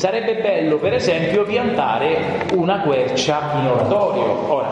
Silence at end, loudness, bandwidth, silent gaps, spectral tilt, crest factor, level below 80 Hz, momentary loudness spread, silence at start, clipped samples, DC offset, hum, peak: 0 s; -18 LUFS; 10 kHz; none; -5.5 dB/octave; 14 dB; -52 dBFS; 2 LU; 0 s; under 0.1%; under 0.1%; none; -4 dBFS